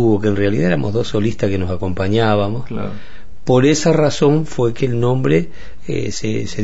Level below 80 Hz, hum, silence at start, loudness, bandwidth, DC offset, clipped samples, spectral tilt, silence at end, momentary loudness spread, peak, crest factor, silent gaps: -40 dBFS; none; 0 s; -17 LUFS; 8 kHz; 7%; under 0.1%; -6.5 dB/octave; 0 s; 12 LU; -2 dBFS; 14 dB; none